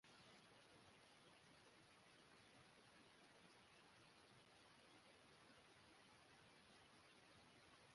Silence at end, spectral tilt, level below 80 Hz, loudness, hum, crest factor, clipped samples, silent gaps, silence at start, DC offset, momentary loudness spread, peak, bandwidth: 0 s; -3 dB/octave; under -90 dBFS; -69 LUFS; none; 14 dB; under 0.1%; none; 0.05 s; under 0.1%; 1 LU; -56 dBFS; 11.5 kHz